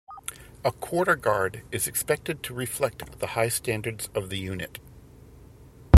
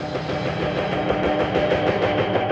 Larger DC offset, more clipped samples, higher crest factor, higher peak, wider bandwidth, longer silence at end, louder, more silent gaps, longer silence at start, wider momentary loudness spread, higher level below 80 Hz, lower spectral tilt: neither; neither; first, 24 dB vs 14 dB; first, 0 dBFS vs -8 dBFS; first, 16.5 kHz vs 8.4 kHz; about the same, 0 s vs 0 s; second, -28 LUFS vs -22 LUFS; neither; about the same, 0.1 s vs 0 s; first, 13 LU vs 5 LU; second, -54 dBFS vs -42 dBFS; second, -5 dB/octave vs -7 dB/octave